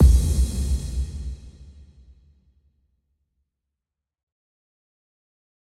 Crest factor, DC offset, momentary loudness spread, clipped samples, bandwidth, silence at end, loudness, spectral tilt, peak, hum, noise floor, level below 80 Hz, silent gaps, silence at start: 20 dB; under 0.1%; 20 LU; under 0.1%; 13 kHz; 3.95 s; -24 LUFS; -6.5 dB/octave; -4 dBFS; none; -86 dBFS; -26 dBFS; none; 0 s